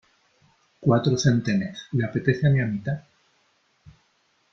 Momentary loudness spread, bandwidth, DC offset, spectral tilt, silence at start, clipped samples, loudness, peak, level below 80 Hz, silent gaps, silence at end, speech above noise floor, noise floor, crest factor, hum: 8 LU; 7.4 kHz; under 0.1%; -6.5 dB/octave; 0.8 s; under 0.1%; -24 LUFS; -6 dBFS; -56 dBFS; none; 1.5 s; 44 dB; -67 dBFS; 20 dB; none